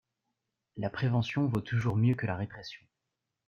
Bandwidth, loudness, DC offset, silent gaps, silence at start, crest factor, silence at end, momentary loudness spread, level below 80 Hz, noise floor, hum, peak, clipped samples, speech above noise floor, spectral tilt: 6.8 kHz; -31 LUFS; under 0.1%; none; 0.75 s; 16 dB; 0.7 s; 17 LU; -62 dBFS; -86 dBFS; none; -16 dBFS; under 0.1%; 56 dB; -8 dB/octave